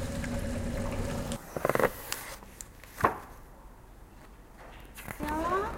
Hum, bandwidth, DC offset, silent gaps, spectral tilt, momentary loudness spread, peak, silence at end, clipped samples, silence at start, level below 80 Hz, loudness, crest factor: none; 17 kHz; under 0.1%; none; -5 dB/octave; 23 LU; -10 dBFS; 0 s; under 0.1%; 0 s; -44 dBFS; -33 LUFS; 26 dB